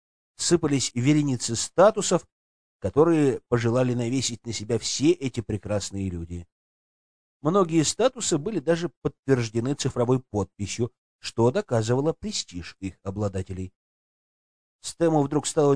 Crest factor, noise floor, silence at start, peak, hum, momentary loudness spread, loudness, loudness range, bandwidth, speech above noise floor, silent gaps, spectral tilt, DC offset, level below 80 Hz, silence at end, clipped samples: 20 dB; under -90 dBFS; 0.4 s; -6 dBFS; none; 13 LU; -25 LUFS; 6 LU; 10.5 kHz; over 66 dB; 2.32-2.80 s, 6.52-7.40 s, 8.97-9.02 s, 9.19-9.23 s, 10.98-11.19 s, 13.76-14.79 s; -5 dB/octave; 0.3%; -54 dBFS; 0 s; under 0.1%